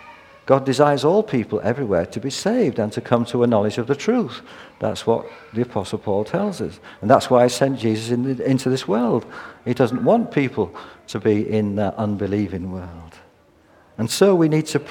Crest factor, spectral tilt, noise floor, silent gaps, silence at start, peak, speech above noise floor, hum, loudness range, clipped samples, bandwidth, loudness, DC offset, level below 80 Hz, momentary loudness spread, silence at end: 20 dB; -6 dB/octave; -54 dBFS; none; 0 s; 0 dBFS; 34 dB; none; 4 LU; under 0.1%; 17.5 kHz; -20 LUFS; under 0.1%; -56 dBFS; 13 LU; 0 s